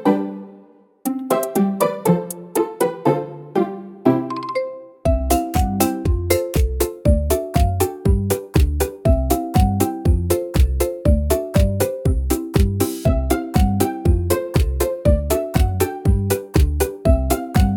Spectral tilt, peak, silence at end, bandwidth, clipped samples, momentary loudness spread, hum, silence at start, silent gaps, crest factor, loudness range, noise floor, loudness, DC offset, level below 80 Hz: -6.5 dB/octave; 0 dBFS; 0 s; 18 kHz; under 0.1%; 5 LU; none; 0 s; none; 18 dB; 2 LU; -48 dBFS; -20 LUFS; under 0.1%; -24 dBFS